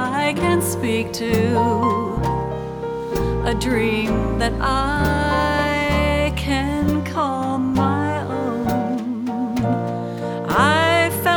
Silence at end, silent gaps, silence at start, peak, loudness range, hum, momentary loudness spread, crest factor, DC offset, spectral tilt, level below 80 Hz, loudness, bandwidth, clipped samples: 0 s; none; 0 s; -4 dBFS; 2 LU; none; 7 LU; 16 dB; under 0.1%; -5.5 dB/octave; -32 dBFS; -20 LUFS; over 20 kHz; under 0.1%